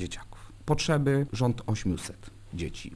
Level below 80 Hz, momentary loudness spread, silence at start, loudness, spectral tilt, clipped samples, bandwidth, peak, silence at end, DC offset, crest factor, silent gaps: -44 dBFS; 17 LU; 0 s; -29 LUFS; -6 dB/octave; under 0.1%; 11 kHz; -10 dBFS; 0 s; under 0.1%; 20 dB; none